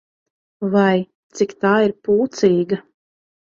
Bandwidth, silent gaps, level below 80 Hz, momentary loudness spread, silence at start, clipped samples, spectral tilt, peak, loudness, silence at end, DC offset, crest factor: 7.4 kHz; 1.15-1.30 s; -60 dBFS; 9 LU; 0.6 s; under 0.1%; -6.5 dB/octave; -2 dBFS; -18 LUFS; 0.8 s; under 0.1%; 16 dB